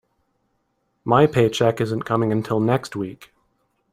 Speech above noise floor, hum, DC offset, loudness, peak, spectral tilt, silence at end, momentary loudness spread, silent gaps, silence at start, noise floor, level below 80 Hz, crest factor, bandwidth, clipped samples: 51 dB; none; under 0.1%; -20 LUFS; -2 dBFS; -6.5 dB/octave; 0.8 s; 13 LU; none; 1.05 s; -70 dBFS; -58 dBFS; 20 dB; 15 kHz; under 0.1%